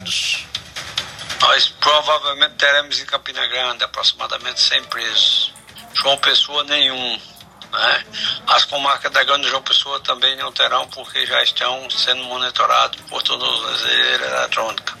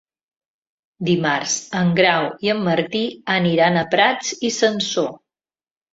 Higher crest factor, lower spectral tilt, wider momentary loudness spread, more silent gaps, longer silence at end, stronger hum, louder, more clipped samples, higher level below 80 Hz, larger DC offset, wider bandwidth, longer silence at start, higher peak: about the same, 18 dB vs 18 dB; second, 0 dB/octave vs -4 dB/octave; about the same, 9 LU vs 7 LU; neither; second, 0 s vs 0.75 s; neither; first, -16 LUFS vs -19 LUFS; neither; about the same, -58 dBFS vs -60 dBFS; neither; first, 16 kHz vs 8 kHz; second, 0 s vs 1 s; about the same, 0 dBFS vs -2 dBFS